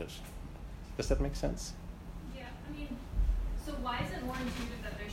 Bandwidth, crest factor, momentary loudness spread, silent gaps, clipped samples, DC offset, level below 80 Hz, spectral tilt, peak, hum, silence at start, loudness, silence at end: 15.5 kHz; 22 dB; 13 LU; none; under 0.1%; under 0.1%; -38 dBFS; -5.5 dB/octave; -16 dBFS; none; 0 s; -39 LUFS; 0 s